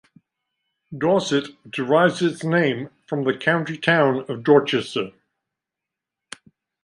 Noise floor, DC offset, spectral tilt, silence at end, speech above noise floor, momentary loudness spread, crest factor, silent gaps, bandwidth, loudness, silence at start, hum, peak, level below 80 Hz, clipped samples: -86 dBFS; under 0.1%; -5.5 dB/octave; 1.75 s; 65 dB; 18 LU; 20 dB; none; 11.5 kHz; -21 LUFS; 0.9 s; none; -2 dBFS; -68 dBFS; under 0.1%